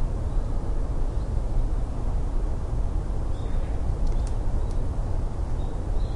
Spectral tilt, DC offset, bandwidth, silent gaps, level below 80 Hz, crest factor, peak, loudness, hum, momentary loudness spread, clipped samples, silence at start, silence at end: -8 dB/octave; under 0.1%; 10 kHz; none; -26 dBFS; 12 dB; -12 dBFS; -31 LUFS; none; 2 LU; under 0.1%; 0 s; 0 s